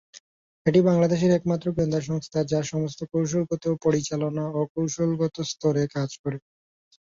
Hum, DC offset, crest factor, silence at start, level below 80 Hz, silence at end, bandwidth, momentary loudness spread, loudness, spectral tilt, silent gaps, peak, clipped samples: none; under 0.1%; 18 dB; 0.15 s; -56 dBFS; 0.8 s; 7.6 kHz; 8 LU; -25 LUFS; -6.5 dB/octave; 0.20-0.65 s, 4.69-4.75 s, 6.19-6.24 s; -6 dBFS; under 0.1%